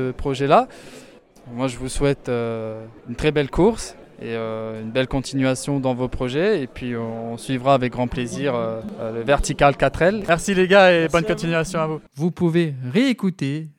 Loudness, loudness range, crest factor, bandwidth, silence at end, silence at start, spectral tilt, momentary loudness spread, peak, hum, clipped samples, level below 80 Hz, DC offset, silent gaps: -21 LUFS; 6 LU; 18 dB; 16.5 kHz; 0.1 s; 0 s; -5.5 dB/octave; 12 LU; -2 dBFS; none; under 0.1%; -38 dBFS; under 0.1%; none